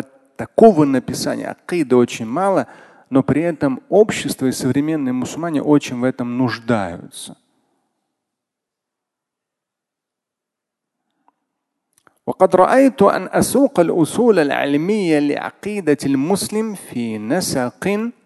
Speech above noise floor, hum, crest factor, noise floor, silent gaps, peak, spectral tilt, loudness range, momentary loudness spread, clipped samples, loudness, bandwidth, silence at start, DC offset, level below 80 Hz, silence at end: 66 dB; none; 18 dB; -83 dBFS; none; 0 dBFS; -5.5 dB/octave; 9 LU; 13 LU; under 0.1%; -17 LUFS; 12.5 kHz; 0 s; under 0.1%; -54 dBFS; 0.15 s